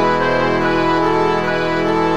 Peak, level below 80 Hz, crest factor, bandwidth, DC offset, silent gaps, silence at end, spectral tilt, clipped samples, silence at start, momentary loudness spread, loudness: -2 dBFS; -44 dBFS; 12 dB; 10 kHz; 3%; none; 0 s; -6 dB/octave; under 0.1%; 0 s; 2 LU; -16 LUFS